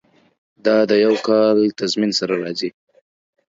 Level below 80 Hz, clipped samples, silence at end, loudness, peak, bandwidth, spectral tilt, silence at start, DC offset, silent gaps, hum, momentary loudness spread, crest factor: -66 dBFS; under 0.1%; 0.9 s; -17 LUFS; -2 dBFS; 7.8 kHz; -4.5 dB/octave; 0.65 s; under 0.1%; none; none; 10 LU; 16 dB